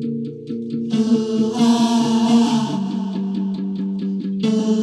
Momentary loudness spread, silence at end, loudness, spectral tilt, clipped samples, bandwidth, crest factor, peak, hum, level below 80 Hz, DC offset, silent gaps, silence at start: 10 LU; 0 s; -19 LUFS; -6 dB/octave; under 0.1%; 11 kHz; 14 dB; -4 dBFS; none; -66 dBFS; under 0.1%; none; 0 s